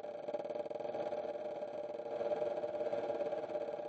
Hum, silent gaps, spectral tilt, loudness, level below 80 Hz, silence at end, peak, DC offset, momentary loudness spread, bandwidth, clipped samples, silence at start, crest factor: none; none; -6 dB/octave; -41 LUFS; -86 dBFS; 0 s; -24 dBFS; under 0.1%; 5 LU; 7.8 kHz; under 0.1%; 0 s; 16 dB